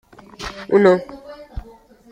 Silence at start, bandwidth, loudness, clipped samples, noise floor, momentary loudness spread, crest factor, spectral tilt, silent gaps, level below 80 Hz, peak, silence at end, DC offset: 0.4 s; 9.6 kHz; -16 LUFS; under 0.1%; -45 dBFS; 23 LU; 18 dB; -6.5 dB/octave; none; -40 dBFS; -2 dBFS; 0.5 s; under 0.1%